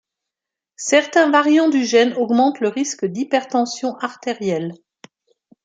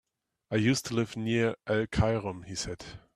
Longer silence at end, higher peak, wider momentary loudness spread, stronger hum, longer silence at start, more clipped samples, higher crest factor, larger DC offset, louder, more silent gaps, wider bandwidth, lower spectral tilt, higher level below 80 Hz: first, 0.9 s vs 0.2 s; first, -2 dBFS vs -14 dBFS; about the same, 11 LU vs 9 LU; neither; first, 0.8 s vs 0.5 s; neither; about the same, 18 dB vs 18 dB; neither; first, -18 LUFS vs -30 LUFS; neither; second, 9.4 kHz vs 14 kHz; second, -4 dB/octave vs -5.5 dB/octave; second, -72 dBFS vs -48 dBFS